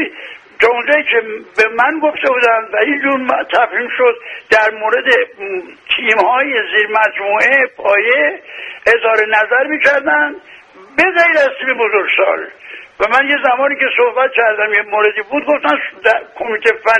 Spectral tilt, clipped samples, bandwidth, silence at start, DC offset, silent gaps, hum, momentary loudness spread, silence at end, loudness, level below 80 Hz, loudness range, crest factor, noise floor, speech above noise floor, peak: -3 dB/octave; under 0.1%; 10.5 kHz; 0 s; under 0.1%; none; none; 9 LU; 0 s; -12 LUFS; -56 dBFS; 1 LU; 14 dB; -33 dBFS; 20 dB; 0 dBFS